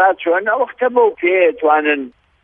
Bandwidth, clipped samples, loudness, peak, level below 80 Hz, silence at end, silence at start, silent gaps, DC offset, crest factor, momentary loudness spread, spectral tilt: 3.7 kHz; under 0.1%; -15 LUFS; 0 dBFS; -62 dBFS; 0.35 s; 0 s; none; under 0.1%; 14 dB; 5 LU; -7.5 dB/octave